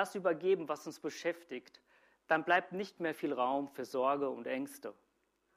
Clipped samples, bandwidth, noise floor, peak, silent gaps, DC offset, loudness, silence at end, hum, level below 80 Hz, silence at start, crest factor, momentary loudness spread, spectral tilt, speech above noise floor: under 0.1%; 15.5 kHz; -78 dBFS; -16 dBFS; none; under 0.1%; -36 LUFS; 0.65 s; none; -84 dBFS; 0 s; 20 dB; 13 LU; -4.5 dB/octave; 42 dB